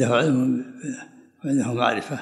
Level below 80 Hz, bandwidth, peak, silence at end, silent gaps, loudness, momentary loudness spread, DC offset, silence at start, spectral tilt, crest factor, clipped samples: -72 dBFS; 12 kHz; -6 dBFS; 0 s; none; -23 LUFS; 15 LU; under 0.1%; 0 s; -6 dB/octave; 18 dB; under 0.1%